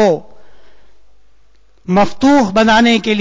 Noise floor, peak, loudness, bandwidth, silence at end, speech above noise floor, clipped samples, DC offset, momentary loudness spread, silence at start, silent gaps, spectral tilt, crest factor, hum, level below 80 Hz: -52 dBFS; -2 dBFS; -12 LUFS; 7.6 kHz; 0 s; 41 dB; under 0.1%; under 0.1%; 9 LU; 0 s; none; -5 dB/octave; 12 dB; none; -44 dBFS